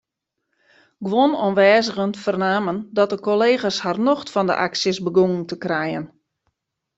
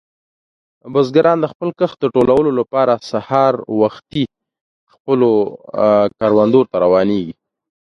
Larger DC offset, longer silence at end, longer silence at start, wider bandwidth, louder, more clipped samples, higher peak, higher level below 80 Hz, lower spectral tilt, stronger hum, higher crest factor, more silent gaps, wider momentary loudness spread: neither; first, 0.9 s vs 0.6 s; first, 1 s vs 0.85 s; first, 8 kHz vs 7 kHz; second, -20 LUFS vs -15 LUFS; neither; about the same, -2 dBFS vs 0 dBFS; second, -64 dBFS vs -52 dBFS; second, -5 dB/octave vs -8 dB/octave; neither; about the same, 18 dB vs 16 dB; second, none vs 1.55-1.60 s, 4.61-4.87 s, 5.00-5.05 s; about the same, 8 LU vs 9 LU